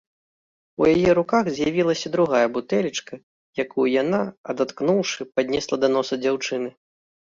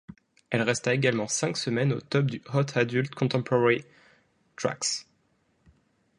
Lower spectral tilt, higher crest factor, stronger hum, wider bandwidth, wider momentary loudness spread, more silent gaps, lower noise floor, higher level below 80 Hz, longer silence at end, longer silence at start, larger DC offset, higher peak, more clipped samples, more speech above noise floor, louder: about the same, -5 dB/octave vs -4.5 dB/octave; second, 16 dB vs 22 dB; neither; second, 7.6 kHz vs 11.5 kHz; first, 11 LU vs 5 LU; first, 3.23-3.53 s, 4.37-4.44 s vs none; first, under -90 dBFS vs -69 dBFS; first, -56 dBFS vs -68 dBFS; second, 0.55 s vs 1.15 s; first, 0.8 s vs 0.5 s; neither; about the same, -6 dBFS vs -8 dBFS; neither; first, over 68 dB vs 43 dB; first, -22 LUFS vs -27 LUFS